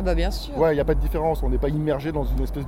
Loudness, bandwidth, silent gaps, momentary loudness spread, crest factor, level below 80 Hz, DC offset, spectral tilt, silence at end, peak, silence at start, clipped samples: -24 LUFS; 15.5 kHz; none; 5 LU; 14 dB; -26 dBFS; under 0.1%; -7.5 dB/octave; 0 s; -8 dBFS; 0 s; under 0.1%